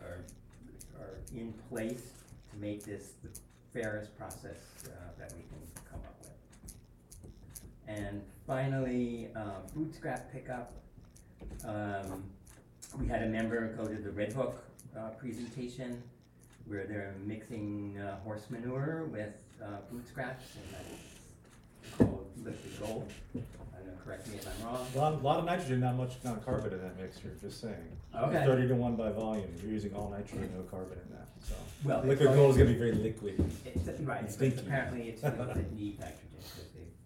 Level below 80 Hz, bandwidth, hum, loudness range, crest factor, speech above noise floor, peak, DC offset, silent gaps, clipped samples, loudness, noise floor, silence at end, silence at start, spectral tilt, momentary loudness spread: -52 dBFS; 16.5 kHz; none; 15 LU; 26 dB; 23 dB; -10 dBFS; under 0.1%; none; under 0.1%; -36 LUFS; -58 dBFS; 0 s; 0 s; -7 dB/octave; 19 LU